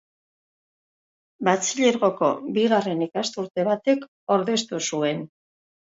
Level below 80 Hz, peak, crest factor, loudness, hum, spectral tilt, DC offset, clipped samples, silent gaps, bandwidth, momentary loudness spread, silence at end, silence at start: -74 dBFS; -4 dBFS; 20 dB; -23 LUFS; none; -4 dB/octave; under 0.1%; under 0.1%; 4.08-4.27 s; 8 kHz; 6 LU; 0.7 s; 1.4 s